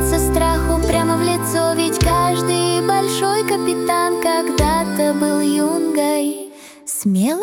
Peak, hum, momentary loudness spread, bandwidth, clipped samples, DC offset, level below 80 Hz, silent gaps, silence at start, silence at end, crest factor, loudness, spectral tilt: -4 dBFS; none; 3 LU; 18 kHz; under 0.1%; under 0.1%; -30 dBFS; none; 0 s; 0 s; 14 dB; -17 LUFS; -4.5 dB/octave